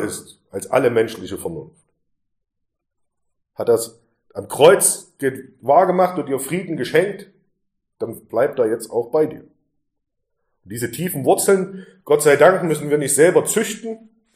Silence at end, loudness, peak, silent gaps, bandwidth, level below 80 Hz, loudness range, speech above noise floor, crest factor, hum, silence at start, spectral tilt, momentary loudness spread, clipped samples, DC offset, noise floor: 0.4 s; -18 LUFS; 0 dBFS; none; 15.5 kHz; -64 dBFS; 8 LU; 58 dB; 20 dB; none; 0 s; -4 dB/octave; 18 LU; under 0.1%; under 0.1%; -76 dBFS